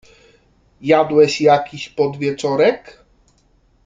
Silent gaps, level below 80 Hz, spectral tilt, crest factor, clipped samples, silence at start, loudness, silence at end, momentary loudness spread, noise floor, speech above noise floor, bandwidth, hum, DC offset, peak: none; -58 dBFS; -5.5 dB/octave; 16 dB; under 0.1%; 0.8 s; -16 LUFS; 0.95 s; 14 LU; -57 dBFS; 41 dB; 7.8 kHz; none; under 0.1%; -2 dBFS